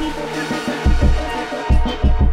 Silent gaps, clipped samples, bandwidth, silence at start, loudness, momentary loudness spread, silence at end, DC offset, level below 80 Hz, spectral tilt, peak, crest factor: none; under 0.1%; 11.5 kHz; 0 s; -20 LUFS; 6 LU; 0 s; under 0.1%; -18 dBFS; -6.5 dB/octave; -4 dBFS; 12 dB